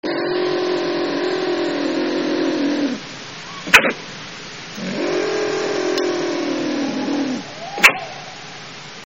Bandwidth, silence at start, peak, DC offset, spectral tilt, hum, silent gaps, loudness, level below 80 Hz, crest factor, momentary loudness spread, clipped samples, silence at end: 8 kHz; 0.05 s; 0 dBFS; 0.4%; -1.5 dB/octave; none; none; -19 LUFS; -56 dBFS; 20 dB; 18 LU; under 0.1%; 0.1 s